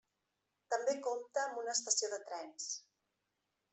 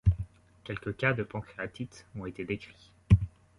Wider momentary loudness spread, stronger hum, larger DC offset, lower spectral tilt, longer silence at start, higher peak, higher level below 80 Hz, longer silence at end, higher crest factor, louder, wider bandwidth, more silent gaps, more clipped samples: second, 10 LU vs 16 LU; neither; neither; second, 1.5 dB/octave vs -8 dB/octave; first, 0.7 s vs 0.05 s; second, -18 dBFS vs -8 dBFS; second, under -90 dBFS vs -40 dBFS; first, 0.9 s vs 0.3 s; about the same, 24 dB vs 24 dB; second, -38 LUFS vs -32 LUFS; second, 8.4 kHz vs 10.5 kHz; neither; neither